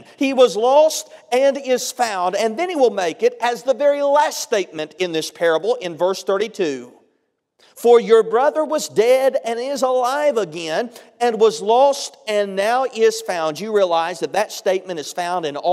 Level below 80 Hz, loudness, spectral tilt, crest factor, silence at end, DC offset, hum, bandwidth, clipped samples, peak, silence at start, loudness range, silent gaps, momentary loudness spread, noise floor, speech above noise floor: -76 dBFS; -18 LUFS; -3 dB/octave; 18 dB; 0 s; under 0.1%; none; 15.5 kHz; under 0.1%; 0 dBFS; 0.2 s; 3 LU; none; 9 LU; -68 dBFS; 50 dB